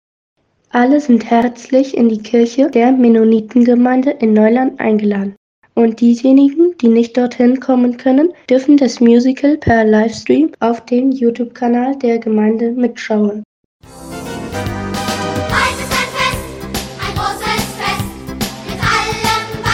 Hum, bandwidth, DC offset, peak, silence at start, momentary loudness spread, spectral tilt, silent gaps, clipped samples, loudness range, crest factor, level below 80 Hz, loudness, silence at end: none; 16 kHz; under 0.1%; 0 dBFS; 0.75 s; 12 LU; -5.5 dB/octave; 5.37-5.62 s, 13.45-13.80 s; under 0.1%; 7 LU; 12 dB; -38 dBFS; -13 LUFS; 0 s